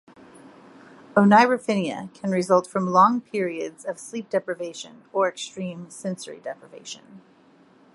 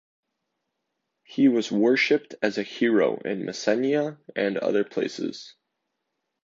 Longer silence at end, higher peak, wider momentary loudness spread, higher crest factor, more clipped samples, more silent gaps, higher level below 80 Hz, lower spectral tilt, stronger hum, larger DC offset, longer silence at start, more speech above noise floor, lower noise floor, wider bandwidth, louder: second, 0.75 s vs 0.95 s; first, -2 dBFS vs -8 dBFS; first, 20 LU vs 10 LU; first, 22 dB vs 16 dB; neither; neither; about the same, -72 dBFS vs -76 dBFS; about the same, -5.5 dB/octave vs -5 dB/octave; neither; neither; second, 1.15 s vs 1.3 s; second, 32 dB vs 56 dB; second, -55 dBFS vs -80 dBFS; first, 11.5 kHz vs 7.8 kHz; about the same, -23 LUFS vs -24 LUFS